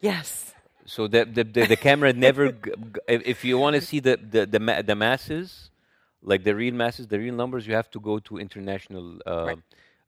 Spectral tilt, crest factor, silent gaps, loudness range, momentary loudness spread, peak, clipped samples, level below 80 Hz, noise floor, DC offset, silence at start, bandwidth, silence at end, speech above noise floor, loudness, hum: -5 dB/octave; 22 dB; none; 6 LU; 16 LU; -2 dBFS; under 0.1%; -58 dBFS; -67 dBFS; under 0.1%; 0.05 s; 16 kHz; 0.5 s; 43 dB; -23 LUFS; none